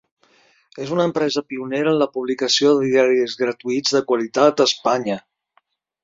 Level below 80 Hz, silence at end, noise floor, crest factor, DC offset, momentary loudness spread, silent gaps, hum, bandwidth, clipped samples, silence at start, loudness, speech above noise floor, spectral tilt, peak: -66 dBFS; 0.85 s; -64 dBFS; 18 dB; under 0.1%; 9 LU; none; none; 7.8 kHz; under 0.1%; 0.75 s; -19 LUFS; 45 dB; -4 dB/octave; -2 dBFS